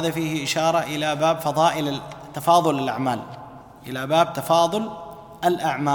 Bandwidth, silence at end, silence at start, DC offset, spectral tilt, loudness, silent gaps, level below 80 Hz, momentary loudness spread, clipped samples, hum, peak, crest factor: 19 kHz; 0 s; 0 s; under 0.1%; -4.5 dB/octave; -22 LUFS; none; -58 dBFS; 17 LU; under 0.1%; none; -4 dBFS; 18 dB